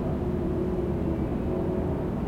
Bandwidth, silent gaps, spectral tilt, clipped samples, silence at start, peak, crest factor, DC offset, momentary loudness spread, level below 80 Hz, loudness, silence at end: 15 kHz; none; -10 dB/octave; under 0.1%; 0 s; -16 dBFS; 12 dB; under 0.1%; 1 LU; -38 dBFS; -29 LUFS; 0 s